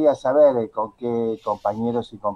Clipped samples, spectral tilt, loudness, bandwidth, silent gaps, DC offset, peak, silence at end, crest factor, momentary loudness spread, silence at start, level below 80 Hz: under 0.1%; -7.5 dB/octave; -21 LUFS; 7.2 kHz; none; under 0.1%; -6 dBFS; 0 s; 16 dB; 10 LU; 0 s; -60 dBFS